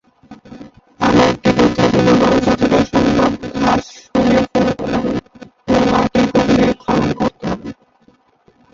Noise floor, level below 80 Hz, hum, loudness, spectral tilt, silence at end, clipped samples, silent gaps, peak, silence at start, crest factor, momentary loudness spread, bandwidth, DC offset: -53 dBFS; -38 dBFS; none; -15 LUFS; -6 dB/octave; 1 s; under 0.1%; none; -2 dBFS; 0.3 s; 14 dB; 9 LU; 7.8 kHz; under 0.1%